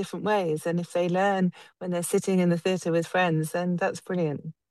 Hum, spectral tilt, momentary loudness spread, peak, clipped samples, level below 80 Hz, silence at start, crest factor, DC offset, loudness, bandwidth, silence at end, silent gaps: none; -6 dB/octave; 6 LU; -10 dBFS; under 0.1%; -74 dBFS; 0 s; 16 dB; under 0.1%; -26 LUFS; 12.5 kHz; 0.2 s; none